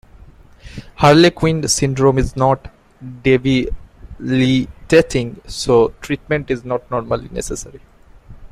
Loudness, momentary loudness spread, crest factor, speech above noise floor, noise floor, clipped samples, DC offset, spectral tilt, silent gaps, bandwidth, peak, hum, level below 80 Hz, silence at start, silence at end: -16 LUFS; 17 LU; 18 dB; 27 dB; -42 dBFS; under 0.1%; under 0.1%; -5 dB/octave; none; 15 kHz; 0 dBFS; none; -36 dBFS; 0.65 s; 0.05 s